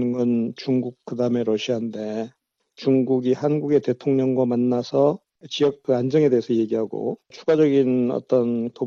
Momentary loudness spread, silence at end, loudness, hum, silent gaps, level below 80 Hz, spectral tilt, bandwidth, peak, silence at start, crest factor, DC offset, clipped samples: 10 LU; 0 s; -22 LUFS; none; none; -70 dBFS; -7.5 dB/octave; 7.2 kHz; -6 dBFS; 0 s; 14 dB; under 0.1%; under 0.1%